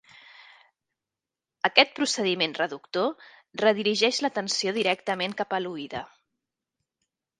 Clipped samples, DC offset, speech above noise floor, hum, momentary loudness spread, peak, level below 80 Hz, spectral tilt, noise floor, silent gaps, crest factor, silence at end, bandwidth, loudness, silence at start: under 0.1%; under 0.1%; 63 dB; none; 13 LU; -2 dBFS; -72 dBFS; -2.5 dB/octave; -89 dBFS; none; 26 dB; 1.35 s; 11.5 kHz; -25 LUFS; 0.4 s